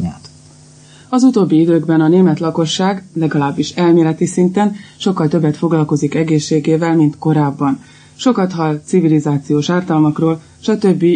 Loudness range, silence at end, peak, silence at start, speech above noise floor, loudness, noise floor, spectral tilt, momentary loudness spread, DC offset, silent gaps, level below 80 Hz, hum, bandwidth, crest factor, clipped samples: 2 LU; 0 s; -2 dBFS; 0 s; 28 dB; -14 LUFS; -42 dBFS; -7 dB/octave; 7 LU; under 0.1%; none; -54 dBFS; none; 9.6 kHz; 12 dB; under 0.1%